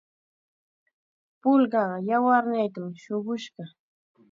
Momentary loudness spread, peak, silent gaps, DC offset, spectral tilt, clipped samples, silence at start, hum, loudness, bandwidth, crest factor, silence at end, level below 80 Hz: 17 LU; -8 dBFS; none; under 0.1%; -7 dB/octave; under 0.1%; 1.45 s; none; -25 LUFS; 7.4 kHz; 18 dB; 0.65 s; -82 dBFS